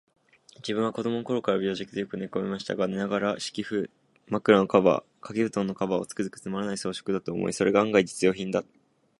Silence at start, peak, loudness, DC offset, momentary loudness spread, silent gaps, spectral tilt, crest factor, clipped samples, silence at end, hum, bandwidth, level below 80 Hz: 0.65 s; -4 dBFS; -27 LUFS; under 0.1%; 11 LU; none; -5.5 dB/octave; 22 dB; under 0.1%; 0.6 s; none; 11.5 kHz; -64 dBFS